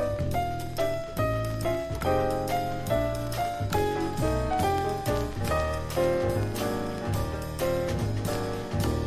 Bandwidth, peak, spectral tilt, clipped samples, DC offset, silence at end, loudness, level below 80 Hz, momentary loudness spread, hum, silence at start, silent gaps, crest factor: 16 kHz; -12 dBFS; -6 dB/octave; under 0.1%; under 0.1%; 0 s; -29 LUFS; -38 dBFS; 4 LU; none; 0 s; none; 14 dB